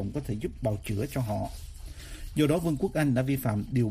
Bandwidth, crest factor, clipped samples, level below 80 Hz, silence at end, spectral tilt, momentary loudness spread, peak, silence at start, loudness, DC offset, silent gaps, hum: 15.5 kHz; 18 dB; under 0.1%; -44 dBFS; 0 s; -7 dB/octave; 18 LU; -12 dBFS; 0 s; -29 LUFS; under 0.1%; none; none